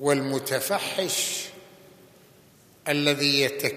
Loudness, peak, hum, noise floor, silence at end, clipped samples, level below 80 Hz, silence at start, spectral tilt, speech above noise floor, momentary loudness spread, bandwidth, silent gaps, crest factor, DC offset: -24 LUFS; -6 dBFS; none; -55 dBFS; 0 s; under 0.1%; -74 dBFS; 0 s; -3 dB/octave; 30 dB; 10 LU; 15 kHz; none; 22 dB; under 0.1%